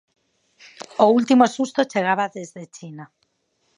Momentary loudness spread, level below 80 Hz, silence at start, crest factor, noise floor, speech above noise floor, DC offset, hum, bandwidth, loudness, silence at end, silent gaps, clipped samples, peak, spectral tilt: 23 LU; -76 dBFS; 1 s; 20 dB; -69 dBFS; 49 dB; under 0.1%; none; 10.5 kHz; -19 LUFS; 0.75 s; none; under 0.1%; -2 dBFS; -5 dB/octave